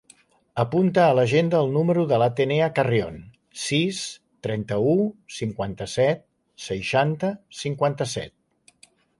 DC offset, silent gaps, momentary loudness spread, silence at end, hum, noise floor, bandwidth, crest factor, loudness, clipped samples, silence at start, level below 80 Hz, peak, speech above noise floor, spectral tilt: under 0.1%; none; 13 LU; 0.9 s; none; -58 dBFS; 11.5 kHz; 18 dB; -23 LUFS; under 0.1%; 0.55 s; -56 dBFS; -6 dBFS; 35 dB; -6 dB/octave